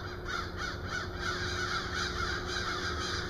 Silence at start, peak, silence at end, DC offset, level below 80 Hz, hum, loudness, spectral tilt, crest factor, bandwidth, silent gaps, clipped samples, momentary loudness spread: 0 s; -20 dBFS; 0 s; under 0.1%; -46 dBFS; none; -34 LUFS; -3.5 dB/octave; 14 dB; 15 kHz; none; under 0.1%; 4 LU